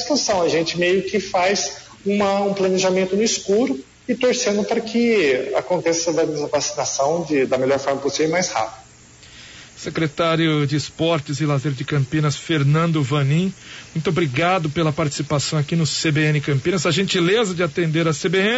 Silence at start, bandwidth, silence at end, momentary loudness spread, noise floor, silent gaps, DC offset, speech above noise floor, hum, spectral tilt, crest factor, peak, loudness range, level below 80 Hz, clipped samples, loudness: 0 s; 8 kHz; 0 s; 6 LU; -46 dBFS; none; under 0.1%; 26 dB; none; -4.5 dB/octave; 12 dB; -8 dBFS; 3 LU; -54 dBFS; under 0.1%; -20 LUFS